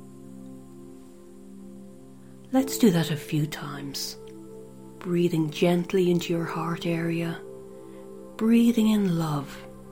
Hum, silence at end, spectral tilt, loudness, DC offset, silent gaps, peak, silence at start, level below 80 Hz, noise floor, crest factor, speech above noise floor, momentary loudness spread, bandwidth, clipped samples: none; 0 s; -6 dB/octave; -25 LUFS; 0.3%; none; -8 dBFS; 0 s; -58 dBFS; -47 dBFS; 20 dB; 23 dB; 24 LU; 16.5 kHz; under 0.1%